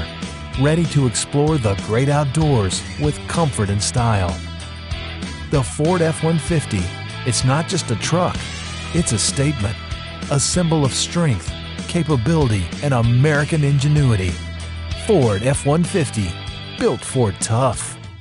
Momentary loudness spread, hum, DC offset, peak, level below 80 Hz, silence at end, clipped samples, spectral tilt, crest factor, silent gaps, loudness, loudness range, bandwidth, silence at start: 12 LU; none; under 0.1%; -4 dBFS; -36 dBFS; 0 s; under 0.1%; -5 dB/octave; 14 dB; none; -19 LUFS; 3 LU; 11.5 kHz; 0 s